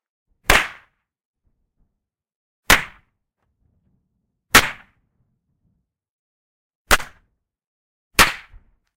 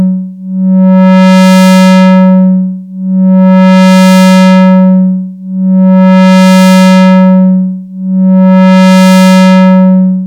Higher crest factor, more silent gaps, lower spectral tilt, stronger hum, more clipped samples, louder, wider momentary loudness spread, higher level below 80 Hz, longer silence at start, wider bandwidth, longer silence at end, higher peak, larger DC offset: first, 24 dB vs 4 dB; first, 1.25-1.34 s, 2.36-2.63 s, 6.10-6.85 s, 7.67-8.11 s vs none; second, -1.5 dB/octave vs -7 dB/octave; neither; neither; second, -17 LUFS vs -4 LUFS; first, 17 LU vs 10 LU; first, -36 dBFS vs -56 dBFS; first, 0.5 s vs 0 s; first, 16 kHz vs 12.5 kHz; first, 0.6 s vs 0 s; about the same, 0 dBFS vs 0 dBFS; neither